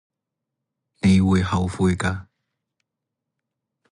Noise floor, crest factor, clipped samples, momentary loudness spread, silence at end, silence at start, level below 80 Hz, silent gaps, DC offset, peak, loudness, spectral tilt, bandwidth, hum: -83 dBFS; 16 dB; under 0.1%; 9 LU; 1.7 s; 1.05 s; -38 dBFS; none; under 0.1%; -8 dBFS; -21 LUFS; -6.5 dB/octave; 11 kHz; none